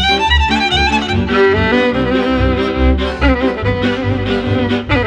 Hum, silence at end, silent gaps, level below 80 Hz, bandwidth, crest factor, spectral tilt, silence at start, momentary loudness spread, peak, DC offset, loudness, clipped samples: none; 0 s; none; -22 dBFS; 9.2 kHz; 12 dB; -6 dB/octave; 0 s; 4 LU; 0 dBFS; under 0.1%; -14 LUFS; under 0.1%